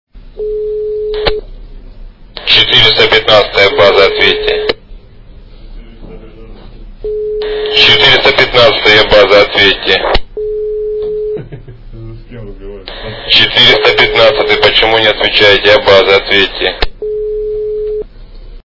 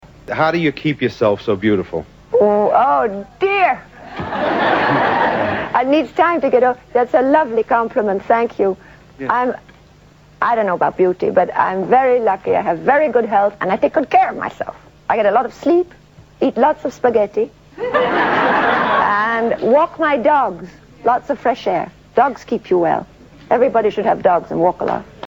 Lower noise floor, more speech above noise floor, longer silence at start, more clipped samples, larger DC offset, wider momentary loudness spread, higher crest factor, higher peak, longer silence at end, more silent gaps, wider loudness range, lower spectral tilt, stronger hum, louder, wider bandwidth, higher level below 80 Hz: second, -33 dBFS vs -46 dBFS; second, 25 dB vs 30 dB; second, 0.15 s vs 0.3 s; first, 2% vs under 0.1%; first, 1% vs under 0.1%; first, 17 LU vs 8 LU; second, 10 dB vs 16 dB; about the same, 0 dBFS vs 0 dBFS; about the same, 0.05 s vs 0 s; neither; first, 9 LU vs 3 LU; second, -4 dB/octave vs -7 dB/octave; second, none vs 50 Hz at -50 dBFS; first, -7 LUFS vs -16 LUFS; second, 6 kHz vs 7.8 kHz; first, -28 dBFS vs -50 dBFS